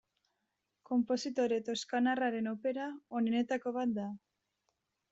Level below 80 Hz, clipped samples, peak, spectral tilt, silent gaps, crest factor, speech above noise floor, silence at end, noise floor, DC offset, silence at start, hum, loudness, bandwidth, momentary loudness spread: -80 dBFS; under 0.1%; -22 dBFS; -3.5 dB/octave; none; 14 dB; 51 dB; 0.95 s; -85 dBFS; under 0.1%; 0.9 s; none; -35 LUFS; 8 kHz; 8 LU